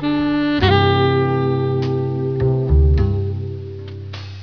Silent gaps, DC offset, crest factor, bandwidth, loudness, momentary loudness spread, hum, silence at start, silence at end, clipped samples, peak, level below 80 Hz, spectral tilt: none; 0.4%; 16 dB; 5.4 kHz; -17 LUFS; 17 LU; none; 0 s; 0 s; under 0.1%; -2 dBFS; -24 dBFS; -9 dB/octave